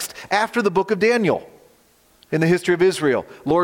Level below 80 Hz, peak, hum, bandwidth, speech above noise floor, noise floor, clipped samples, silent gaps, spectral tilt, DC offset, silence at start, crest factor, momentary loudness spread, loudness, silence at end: -58 dBFS; -4 dBFS; none; 17 kHz; 38 dB; -56 dBFS; under 0.1%; none; -5.5 dB/octave; under 0.1%; 0 s; 16 dB; 6 LU; -20 LUFS; 0 s